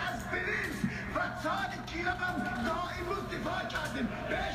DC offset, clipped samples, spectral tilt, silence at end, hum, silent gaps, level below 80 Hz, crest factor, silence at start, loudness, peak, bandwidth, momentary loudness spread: under 0.1%; under 0.1%; -5 dB/octave; 0 s; none; none; -50 dBFS; 14 dB; 0 s; -34 LUFS; -20 dBFS; 15.5 kHz; 3 LU